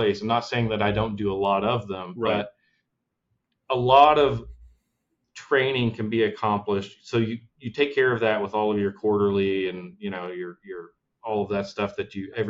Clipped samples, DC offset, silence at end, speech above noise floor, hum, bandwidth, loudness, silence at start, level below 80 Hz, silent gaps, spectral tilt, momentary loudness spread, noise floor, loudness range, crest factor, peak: under 0.1%; under 0.1%; 0 s; 55 dB; none; 7.6 kHz; -24 LUFS; 0 s; -52 dBFS; none; -6.5 dB/octave; 13 LU; -79 dBFS; 5 LU; 22 dB; -2 dBFS